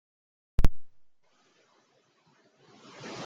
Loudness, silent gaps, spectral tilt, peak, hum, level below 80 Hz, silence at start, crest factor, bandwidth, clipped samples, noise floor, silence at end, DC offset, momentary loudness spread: -34 LUFS; none; -6 dB/octave; -6 dBFS; none; -34 dBFS; 0.6 s; 22 dB; 7.2 kHz; under 0.1%; -68 dBFS; 0 s; under 0.1%; 24 LU